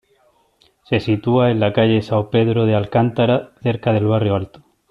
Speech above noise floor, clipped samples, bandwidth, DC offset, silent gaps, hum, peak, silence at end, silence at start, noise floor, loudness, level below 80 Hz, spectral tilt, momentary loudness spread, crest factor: 42 dB; under 0.1%; 6 kHz; under 0.1%; none; none; -2 dBFS; 0.45 s; 0.9 s; -58 dBFS; -17 LUFS; -52 dBFS; -9 dB/octave; 6 LU; 14 dB